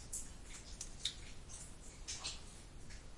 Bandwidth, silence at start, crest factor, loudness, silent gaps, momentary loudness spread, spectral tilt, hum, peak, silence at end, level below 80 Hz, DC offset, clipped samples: 11.5 kHz; 0 s; 28 dB; -48 LUFS; none; 12 LU; -1.5 dB/octave; none; -22 dBFS; 0 s; -54 dBFS; under 0.1%; under 0.1%